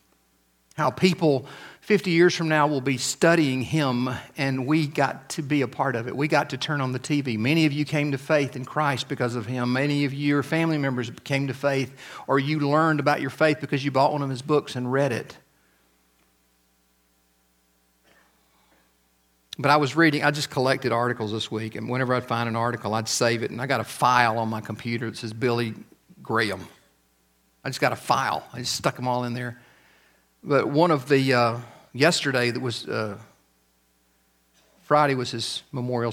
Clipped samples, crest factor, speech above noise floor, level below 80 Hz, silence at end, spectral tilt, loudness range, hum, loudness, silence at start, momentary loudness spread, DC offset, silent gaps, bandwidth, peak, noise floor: under 0.1%; 24 dB; 42 dB; -66 dBFS; 0 s; -5 dB/octave; 5 LU; none; -24 LUFS; 0.75 s; 10 LU; under 0.1%; none; 16.5 kHz; -2 dBFS; -66 dBFS